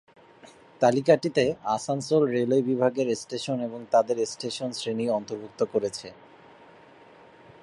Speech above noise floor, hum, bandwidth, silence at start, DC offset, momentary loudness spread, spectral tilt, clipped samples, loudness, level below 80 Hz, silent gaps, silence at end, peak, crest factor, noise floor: 27 dB; none; 11.5 kHz; 0.45 s; under 0.1%; 9 LU; -5.5 dB/octave; under 0.1%; -26 LUFS; -68 dBFS; none; 1.5 s; -6 dBFS; 20 dB; -52 dBFS